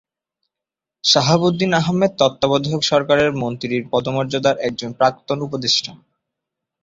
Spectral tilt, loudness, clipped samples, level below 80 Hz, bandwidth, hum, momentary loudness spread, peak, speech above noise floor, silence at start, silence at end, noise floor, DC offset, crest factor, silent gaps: -4.5 dB/octave; -18 LUFS; under 0.1%; -54 dBFS; 7.8 kHz; none; 9 LU; -2 dBFS; 69 dB; 1.05 s; 0.85 s; -86 dBFS; under 0.1%; 18 dB; none